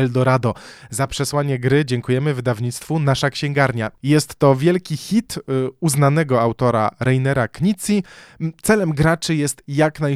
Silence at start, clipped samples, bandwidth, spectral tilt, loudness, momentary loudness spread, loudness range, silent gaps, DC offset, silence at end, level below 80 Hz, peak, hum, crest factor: 0 s; under 0.1%; 15 kHz; -6 dB/octave; -19 LUFS; 8 LU; 2 LU; none; under 0.1%; 0 s; -46 dBFS; -2 dBFS; none; 18 dB